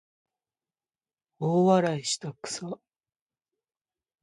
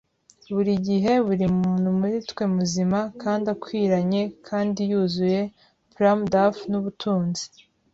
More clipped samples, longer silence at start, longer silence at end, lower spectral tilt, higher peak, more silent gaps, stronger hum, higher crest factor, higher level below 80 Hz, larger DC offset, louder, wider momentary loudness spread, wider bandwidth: neither; first, 1.4 s vs 0.5 s; first, 1.45 s vs 0.45 s; second, -5 dB/octave vs -6.5 dB/octave; about the same, -8 dBFS vs -6 dBFS; neither; neither; about the same, 22 dB vs 18 dB; second, -74 dBFS vs -56 dBFS; neither; second, -27 LUFS vs -23 LUFS; first, 16 LU vs 7 LU; first, 11.5 kHz vs 7.8 kHz